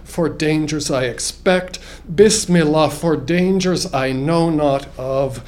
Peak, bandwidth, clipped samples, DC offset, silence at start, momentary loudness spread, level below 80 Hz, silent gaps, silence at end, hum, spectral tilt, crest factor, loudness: 0 dBFS; 16 kHz; under 0.1%; under 0.1%; 0 s; 8 LU; -38 dBFS; none; 0 s; none; -5 dB/octave; 16 dB; -17 LUFS